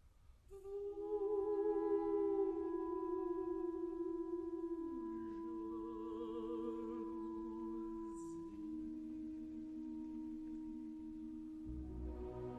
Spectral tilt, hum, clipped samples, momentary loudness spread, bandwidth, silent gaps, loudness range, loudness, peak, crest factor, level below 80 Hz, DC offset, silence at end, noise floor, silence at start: -8.5 dB/octave; none; under 0.1%; 11 LU; 9.2 kHz; none; 8 LU; -44 LUFS; -28 dBFS; 16 dB; -60 dBFS; under 0.1%; 0 s; -64 dBFS; 0.05 s